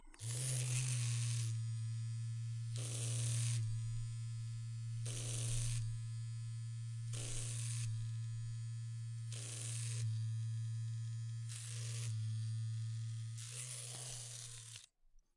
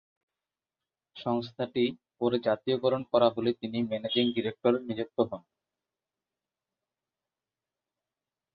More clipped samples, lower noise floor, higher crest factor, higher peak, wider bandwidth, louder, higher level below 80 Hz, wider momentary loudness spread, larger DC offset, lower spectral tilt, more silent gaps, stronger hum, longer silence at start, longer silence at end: neither; second, -68 dBFS vs under -90 dBFS; about the same, 20 dB vs 22 dB; second, -22 dBFS vs -10 dBFS; first, 11.5 kHz vs 5.6 kHz; second, -43 LUFS vs -29 LUFS; first, -58 dBFS vs -70 dBFS; about the same, 8 LU vs 7 LU; neither; second, -4 dB/octave vs -8.5 dB/octave; neither; neither; second, 0 s vs 1.15 s; second, 0.2 s vs 3.15 s